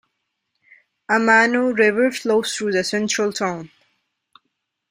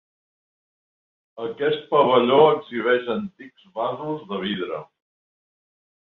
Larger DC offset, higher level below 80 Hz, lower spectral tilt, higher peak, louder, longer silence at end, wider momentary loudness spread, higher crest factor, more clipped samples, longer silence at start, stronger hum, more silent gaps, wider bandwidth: neither; about the same, -66 dBFS vs -70 dBFS; second, -3.5 dB/octave vs -8 dB/octave; about the same, -2 dBFS vs -2 dBFS; first, -18 LUFS vs -21 LUFS; about the same, 1.25 s vs 1.25 s; second, 9 LU vs 17 LU; about the same, 20 dB vs 22 dB; neither; second, 1.1 s vs 1.35 s; neither; neither; first, 16 kHz vs 4.2 kHz